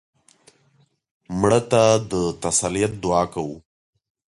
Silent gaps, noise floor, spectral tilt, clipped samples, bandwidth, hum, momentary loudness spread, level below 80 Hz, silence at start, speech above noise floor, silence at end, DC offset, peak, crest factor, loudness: none; -62 dBFS; -4.5 dB/octave; under 0.1%; 11.5 kHz; none; 14 LU; -48 dBFS; 1.3 s; 42 dB; 0.7 s; under 0.1%; -4 dBFS; 18 dB; -20 LUFS